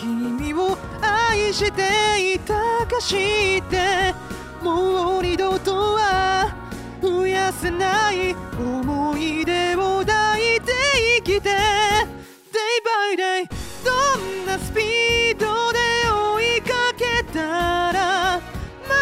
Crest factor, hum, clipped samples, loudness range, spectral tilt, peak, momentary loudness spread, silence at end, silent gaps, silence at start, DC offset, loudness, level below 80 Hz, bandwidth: 14 dB; none; under 0.1%; 3 LU; -3.5 dB/octave; -6 dBFS; 8 LU; 0 s; none; 0 s; under 0.1%; -20 LUFS; -40 dBFS; 16 kHz